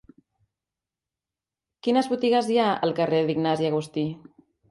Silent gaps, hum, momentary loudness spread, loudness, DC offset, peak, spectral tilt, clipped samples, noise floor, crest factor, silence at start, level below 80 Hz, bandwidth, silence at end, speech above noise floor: none; none; 9 LU; -24 LUFS; under 0.1%; -8 dBFS; -6.5 dB/octave; under 0.1%; -90 dBFS; 18 dB; 1.85 s; -68 dBFS; 11.5 kHz; 0.5 s; 67 dB